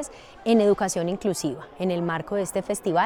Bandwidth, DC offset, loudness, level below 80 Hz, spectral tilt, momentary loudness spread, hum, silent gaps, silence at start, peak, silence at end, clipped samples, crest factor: 18 kHz; under 0.1%; -25 LUFS; -56 dBFS; -5 dB/octave; 10 LU; none; none; 0 s; -8 dBFS; 0 s; under 0.1%; 16 dB